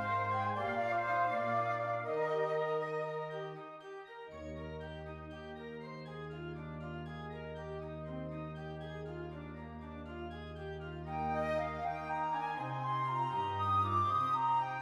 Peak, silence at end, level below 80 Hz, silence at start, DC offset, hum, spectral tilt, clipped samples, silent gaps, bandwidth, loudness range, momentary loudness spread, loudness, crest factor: -22 dBFS; 0 s; -58 dBFS; 0 s; under 0.1%; none; -7 dB/octave; under 0.1%; none; 12 kHz; 11 LU; 15 LU; -37 LUFS; 16 dB